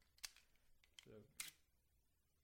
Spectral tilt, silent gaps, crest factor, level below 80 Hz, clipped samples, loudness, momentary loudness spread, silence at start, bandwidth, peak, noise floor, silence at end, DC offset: -0.5 dB/octave; none; 36 dB; -80 dBFS; under 0.1%; -57 LUFS; 12 LU; 0 s; 16.5 kHz; -26 dBFS; -82 dBFS; 0 s; under 0.1%